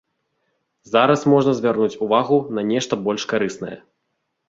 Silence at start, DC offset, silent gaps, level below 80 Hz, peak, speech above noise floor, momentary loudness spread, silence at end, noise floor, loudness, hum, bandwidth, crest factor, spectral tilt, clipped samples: 0.9 s; under 0.1%; none; -62 dBFS; -2 dBFS; 56 dB; 7 LU; 0.7 s; -74 dBFS; -19 LUFS; none; 7.8 kHz; 18 dB; -5.5 dB/octave; under 0.1%